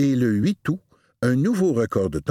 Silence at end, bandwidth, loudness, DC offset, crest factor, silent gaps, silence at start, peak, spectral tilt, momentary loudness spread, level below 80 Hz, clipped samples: 0 s; 15 kHz; -22 LUFS; under 0.1%; 14 dB; none; 0 s; -6 dBFS; -7.5 dB/octave; 7 LU; -50 dBFS; under 0.1%